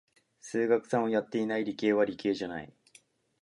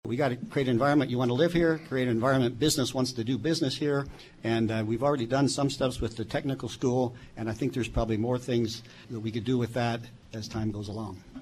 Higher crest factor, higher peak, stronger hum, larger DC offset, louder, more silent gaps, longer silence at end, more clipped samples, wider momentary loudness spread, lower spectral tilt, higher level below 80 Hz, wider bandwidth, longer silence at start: about the same, 18 dB vs 16 dB; about the same, -12 dBFS vs -12 dBFS; neither; neither; about the same, -30 LUFS vs -29 LUFS; neither; first, 0.75 s vs 0 s; neither; about the same, 13 LU vs 11 LU; about the same, -5.5 dB/octave vs -5.5 dB/octave; second, -72 dBFS vs -48 dBFS; second, 11.5 kHz vs 14 kHz; first, 0.45 s vs 0.05 s